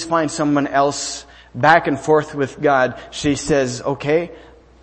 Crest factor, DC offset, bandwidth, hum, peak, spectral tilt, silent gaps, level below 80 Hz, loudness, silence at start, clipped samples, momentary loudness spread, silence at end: 18 dB; under 0.1%; 8.8 kHz; none; 0 dBFS; -4.5 dB/octave; none; -46 dBFS; -18 LUFS; 0 s; under 0.1%; 11 LU; 0.4 s